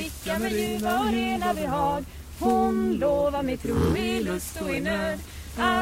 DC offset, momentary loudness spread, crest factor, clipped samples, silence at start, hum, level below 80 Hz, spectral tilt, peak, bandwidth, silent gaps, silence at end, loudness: under 0.1%; 7 LU; 16 dB; under 0.1%; 0 s; none; -40 dBFS; -5 dB/octave; -10 dBFS; 16 kHz; none; 0 s; -26 LUFS